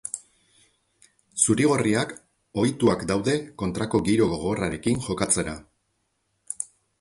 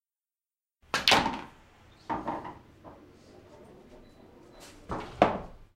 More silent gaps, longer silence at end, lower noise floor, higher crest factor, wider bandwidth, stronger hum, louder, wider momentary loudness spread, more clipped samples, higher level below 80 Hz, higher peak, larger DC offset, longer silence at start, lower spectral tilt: neither; first, 0.35 s vs 0.1 s; second, -73 dBFS vs under -90 dBFS; second, 20 dB vs 32 dB; second, 11.5 kHz vs 16 kHz; neither; first, -24 LUFS vs -29 LUFS; second, 14 LU vs 28 LU; neither; about the same, -50 dBFS vs -54 dBFS; second, -6 dBFS vs -2 dBFS; neither; second, 0.05 s vs 0.95 s; first, -4.5 dB/octave vs -3 dB/octave